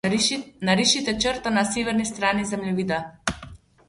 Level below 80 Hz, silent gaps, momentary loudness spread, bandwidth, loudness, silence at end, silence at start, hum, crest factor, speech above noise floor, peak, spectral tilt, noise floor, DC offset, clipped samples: -50 dBFS; none; 10 LU; 11.5 kHz; -23 LUFS; 0.3 s; 0.05 s; none; 20 dB; 21 dB; -4 dBFS; -3.5 dB/octave; -45 dBFS; under 0.1%; under 0.1%